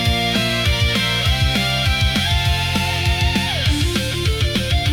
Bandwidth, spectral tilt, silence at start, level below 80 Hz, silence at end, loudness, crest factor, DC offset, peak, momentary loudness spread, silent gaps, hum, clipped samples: 18 kHz; -4 dB/octave; 0 s; -26 dBFS; 0 s; -17 LUFS; 12 dB; under 0.1%; -6 dBFS; 2 LU; none; none; under 0.1%